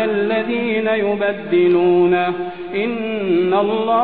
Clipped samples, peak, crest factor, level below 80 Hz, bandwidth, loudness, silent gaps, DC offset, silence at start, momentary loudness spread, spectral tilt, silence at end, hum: under 0.1%; -4 dBFS; 12 dB; -56 dBFS; 4.4 kHz; -17 LUFS; none; 0.6%; 0 s; 8 LU; -10 dB/octave; 0 s; none